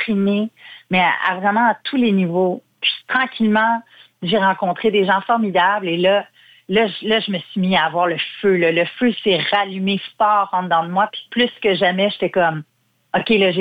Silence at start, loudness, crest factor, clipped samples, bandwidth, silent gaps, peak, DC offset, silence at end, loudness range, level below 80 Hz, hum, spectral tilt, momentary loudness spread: 0 s; -18 LUFS; 14 dB; under 0.1%; 5 kHz; none; -4 dBFS; under 0.1%; 0 s; 1 LU; -60 dBFS; none; -7.5 dB/octave; 5 LU